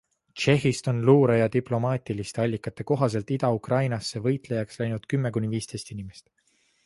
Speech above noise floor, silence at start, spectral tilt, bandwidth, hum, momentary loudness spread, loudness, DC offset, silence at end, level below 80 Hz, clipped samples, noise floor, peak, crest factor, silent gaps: 43 dB; 0.35 s; -6.5 dB/octave; 11.5 kHz; none; 13 LU; -25 LUFS; under 0.1%; 0.65 s; -58 dBFS; under 0.1%; -67 dBFS; -6 dBFS; 20 dB; none